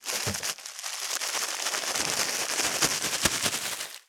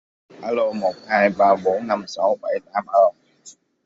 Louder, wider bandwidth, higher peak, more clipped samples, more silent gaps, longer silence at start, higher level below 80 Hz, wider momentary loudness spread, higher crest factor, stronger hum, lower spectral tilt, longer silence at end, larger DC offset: second, -27 LUFS vs -20 LUFS; first, over 20 kHz vs 7.8 kHz; about the same, -6 dBFS vs -4 dBFS; neither; neither; second, 0 s vs 0.4 s; first, -60 dBFS vs -68 dBFS; about the same, 8 LU vs 9 LU; first, 24 dB vs 18 dB; neither; second, -0.5 dB/octave vs -5.5 dB/octave; second, 0.1 s vs 0.35 s; neither